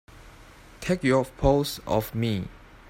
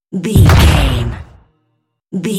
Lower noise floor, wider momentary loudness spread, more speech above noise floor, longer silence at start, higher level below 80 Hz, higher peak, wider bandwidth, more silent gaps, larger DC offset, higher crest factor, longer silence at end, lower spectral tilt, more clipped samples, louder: second, -49 dBFS vs -65 dBFS; second, 10 LU vs 17 LU; second, 25 dB vs 56 dB; about the same, 0.15 s vs 0.1 s; second, -40 dBFS vs -18 dBFS; second, -6 dBFS vs 0 dBFS; about the same, 16.5 kHz vs 17 kHz; neither; neither; first, 20 dB vs 12 dB; first, 0.3 s vs 0 s; about the same, -6 dB/octave vs -6 dB/octave; second, under 0.1% vs 0.2%; second, -26 LUFS vs -11 LUFS